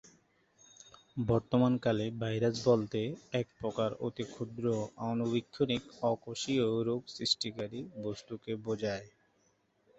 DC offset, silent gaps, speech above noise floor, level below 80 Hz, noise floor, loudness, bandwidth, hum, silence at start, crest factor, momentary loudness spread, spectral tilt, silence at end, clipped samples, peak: under 0.1%; none; 40 dB; -64 dBFS; -73 dBFS; -34 LUFS; 8.2 kHz; none; 1.15 s; 20 dB; 11 LU; -6 dB/octave; 0.9 s; under 0.1%; -14 dBFS